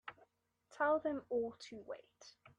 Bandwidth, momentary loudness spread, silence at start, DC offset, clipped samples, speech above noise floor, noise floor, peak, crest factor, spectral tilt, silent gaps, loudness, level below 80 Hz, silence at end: 9.2 kHz; 21 LU; 0.05 s; under 0.1%; under 0.1%; 34 dB; -74 dBFS; -24 dBFS; 18 dB; -4.5 dB/octave; none; -39 LUFS; -80 dBFS; 0.3 s